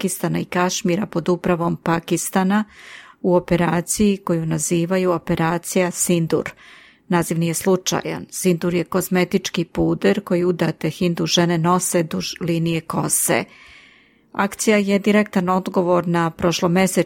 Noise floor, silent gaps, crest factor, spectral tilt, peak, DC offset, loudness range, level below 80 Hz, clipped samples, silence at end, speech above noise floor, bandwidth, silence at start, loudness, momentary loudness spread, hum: -52 dBFS; none; 16 dB; -5 dB/octave; -4 dBFS; under 0.1%; 2 LU; -50 dBFS; under 0.1%; 0 s; 33 dB; 17.5 kHz; 0 s; -20 LUFS; 6 LU; none